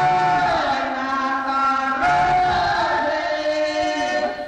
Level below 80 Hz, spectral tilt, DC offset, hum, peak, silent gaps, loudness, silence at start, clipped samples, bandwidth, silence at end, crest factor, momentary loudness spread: -46 dBFS; -4 dB/octave; under 0.1%; none; -10 dBFS; none; -20 LUFS; 0 s; under 0.1%; 9.4 kHz; 0 s; 10 dB; 5 LU